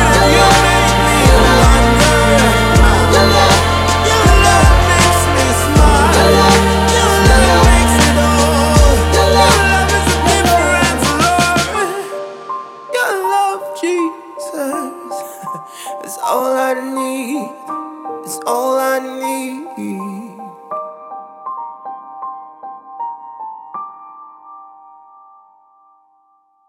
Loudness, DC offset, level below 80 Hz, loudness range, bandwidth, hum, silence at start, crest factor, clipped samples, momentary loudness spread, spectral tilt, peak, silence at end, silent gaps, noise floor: -11 LUFS; under 0.1%; -20 dBFS; 19 LU; 16.5 kHz; none; 0 s; 12 dB; under 0.1%; 20 LU; -4 dB/octave; 0 dBFS; 2.1 s; none; -56 dBFS